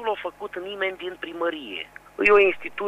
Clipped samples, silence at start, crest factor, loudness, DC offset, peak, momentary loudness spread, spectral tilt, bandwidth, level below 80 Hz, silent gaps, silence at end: under 0.1%; 0 s; 22 dB; -23 LUFS; under 0.1%; -4 dBFS; 17 LU; -4.5 dB/octave; 10 kHz; -56 dBFS; none; 0 s